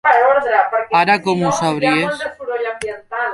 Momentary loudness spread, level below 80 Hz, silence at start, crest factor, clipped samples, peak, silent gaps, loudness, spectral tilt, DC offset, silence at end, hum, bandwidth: 11 LU; -56 dBFS; 0.05 s; 16 dB; under 0.1%; -2 dBFS; none; -16 LUFS; -4.5 dB/octave; under 0.1%; 0 s; none; 11.5 kHz